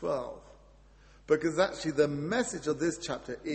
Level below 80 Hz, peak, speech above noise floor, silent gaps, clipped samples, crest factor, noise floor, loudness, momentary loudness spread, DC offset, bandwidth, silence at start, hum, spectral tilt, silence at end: -58 dBFS; -12 dBFS; 27 dB; none; under 0.1%; 20 dB; -57 dBFS; -31 LUFS; 9 LU; under 0.1%; 8.8 kHz; 0 s; none; -4.5 dB/octave; 0 s